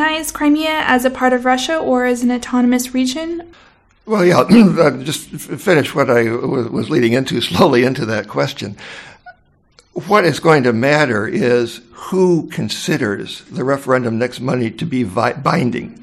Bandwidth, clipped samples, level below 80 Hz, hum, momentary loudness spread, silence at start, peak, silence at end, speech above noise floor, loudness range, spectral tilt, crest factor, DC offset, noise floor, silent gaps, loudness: 16 kHz; under 0.1%; -50 dBFS; none; 11 LU; 0 s; 0 dBFS; 0.1 s; 37 dB; 4 LU; -5.5 dB/octave; 16 dB; under 0.1%; -52 dBFS; none; -15 LUFS